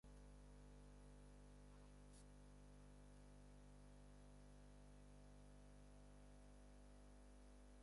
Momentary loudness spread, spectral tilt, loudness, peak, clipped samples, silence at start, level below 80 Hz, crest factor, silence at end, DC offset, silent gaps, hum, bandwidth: 1 LU; -5.5 dB/octave; -66 LUFS; -54 dBFS; under 0.1%; 0.05 s; -66 dBFS; 10 dB; 0 s; under 0.1%; none; 50 Hz at -65 dBFS; 11 kHz